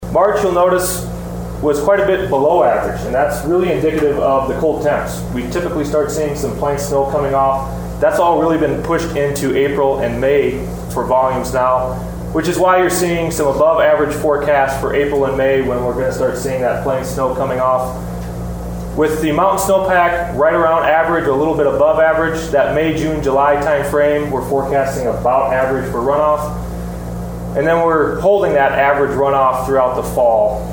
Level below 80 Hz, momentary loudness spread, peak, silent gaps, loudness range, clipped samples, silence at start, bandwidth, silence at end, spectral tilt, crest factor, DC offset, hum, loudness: -32 dBFS; 8 LU; 0 dBFS; none; 3 LU; under 0.1%; 0 s; over 20 kHz; 0 s; -5.5 dB/octave; 14 dB; under 0.1%; none; -15 LUFS